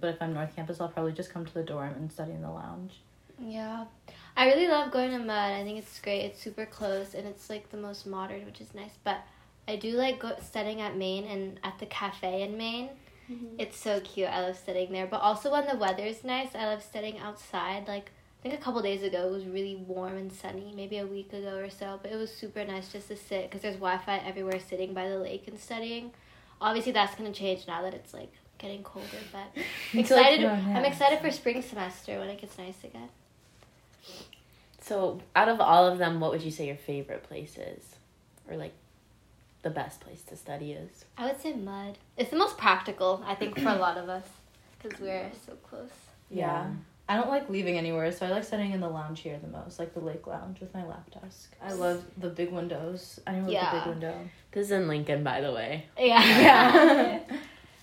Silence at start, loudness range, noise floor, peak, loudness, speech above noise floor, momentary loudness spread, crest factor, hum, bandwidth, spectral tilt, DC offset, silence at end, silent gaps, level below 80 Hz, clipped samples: 0 s; 12 LU; -61 dBFS; -4 dBFS; -29 LUFS; 31 dB; 18 LU; 26 dB; none; 16 kHz; -5 dB/octave; under 0.1%; 0.2 s; none; -66 dBFS; under 0.1%